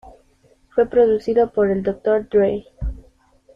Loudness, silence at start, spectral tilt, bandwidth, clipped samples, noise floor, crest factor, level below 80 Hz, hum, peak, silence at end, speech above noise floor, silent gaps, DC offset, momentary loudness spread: -19 LUFS; 0.05 s; -8.5 dB/octave; 5.6 kHz; under 0.1%; -57 dBFS; 16 dB; -38 dBFS; none; -4 dBFS; 0.55 s; 39 dB; none; under 0.1%; 14 LU